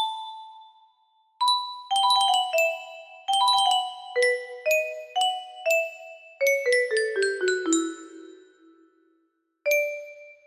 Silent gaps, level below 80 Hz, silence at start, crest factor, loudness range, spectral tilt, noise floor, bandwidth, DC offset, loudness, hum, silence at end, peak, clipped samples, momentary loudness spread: none; -78 dBFS; 0 s; 16 dB; 5 LU; 0.5 dB/octave; -71 dBFS; 15.5 kHz; under 0.1%; -24 LUFS; none; 0.15 s; -10 dBFS; under 0.1%; 17 LU